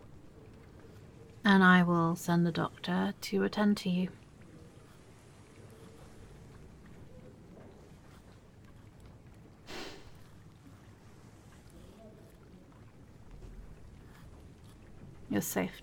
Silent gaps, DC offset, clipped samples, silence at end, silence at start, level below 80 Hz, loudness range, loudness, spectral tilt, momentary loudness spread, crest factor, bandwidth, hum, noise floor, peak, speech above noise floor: none; under 0.1%; under 0.1%; 0 s; 0.05 s; -60 dBFS; 26 LU; -30 LUFS; -6 dB/octave; 27 LU; 24 dB; 17.5 kHz; none; -56 dBFS; -12 dBFS; 27 dB